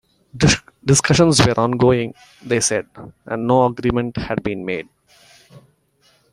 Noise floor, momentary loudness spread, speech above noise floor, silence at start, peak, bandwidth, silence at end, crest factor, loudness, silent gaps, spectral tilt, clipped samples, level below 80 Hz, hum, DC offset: -59 dBFS; 13 LU; 41 dB; 0.35 s; -2 dBFS; 14.5 kHz; 0.75 s; 18 dB; -18 LUFS; none; -4.5 dB/octave; under 0.1%; -42 dBFS; none; under 0.1%